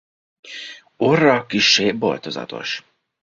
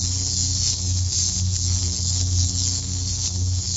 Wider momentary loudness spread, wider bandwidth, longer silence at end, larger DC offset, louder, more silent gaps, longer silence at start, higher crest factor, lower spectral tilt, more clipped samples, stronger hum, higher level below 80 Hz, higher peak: first, 19 LU vs 3 LU; about the same, 7.6 kHz vs 8 kHz; first, 0.4 s vs 0 s; neither; first, -18 LUFS vs -21 LUFS; neither; first, 0.45 s vs 0 s; about the same, 20 dB vs 16 dB; about the same, -3.5 dB/octave vs -2.5 dB/octave; neither; neither; second, -60 dBFS vs -34 dBFS; first, -2 dBFS vs -6 dBFS